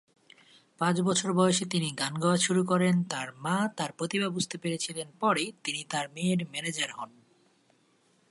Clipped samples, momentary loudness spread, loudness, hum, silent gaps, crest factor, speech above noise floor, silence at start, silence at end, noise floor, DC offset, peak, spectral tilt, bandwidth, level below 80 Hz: under 0.1%; 9 LU; -29 LUFS; none; none; 20 dB; 38 dB; 0.8 s; 1.2 s; -67 dBFS; under 0.1%; -10 dBFS; -4.5 dB/octave; 11.5 kHz; -74 dBFS